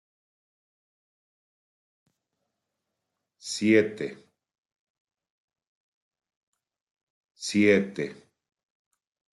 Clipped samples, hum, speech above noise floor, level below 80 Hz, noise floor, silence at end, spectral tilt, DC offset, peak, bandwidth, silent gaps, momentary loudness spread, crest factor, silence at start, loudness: under 0.1%; none; 60 dB; -78 dBFS; -84 dBFS; 1.2 s; -5 dB/octave; under 0.1%; -8 dBFS; 11.5 kHz; 4.58-4.63 s, 4.79-5.05 s, 5.30-5.48 s, 5.67-6.11 s, 6.37-6.53 s, 6.81-6.97 s, 7.03-7.35 s; 15 LU; 24 dB; 3.45 s; -24 LUFS